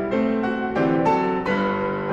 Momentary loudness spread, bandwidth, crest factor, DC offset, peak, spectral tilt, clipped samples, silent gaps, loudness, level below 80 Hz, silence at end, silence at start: 4 LU; 8 kHz; 14 dB; under 0.1%; -8 dBFS; -7.5 dB/octave; under 0.1%; none; -22 LUFS; -50 dBFS; 0 s; 0 s